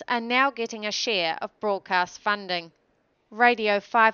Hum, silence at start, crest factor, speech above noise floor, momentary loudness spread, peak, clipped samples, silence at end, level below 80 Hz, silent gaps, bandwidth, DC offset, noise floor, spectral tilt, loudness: none; 0 s; 20 dB; 44 dB; 10 LU; -4 dBFS; under 0.1%; 0 s; -74 dBFS; none; 7.2 kHz; under 0.1%; -68 dBFS; -2.5 dB/octave; -24 LUFS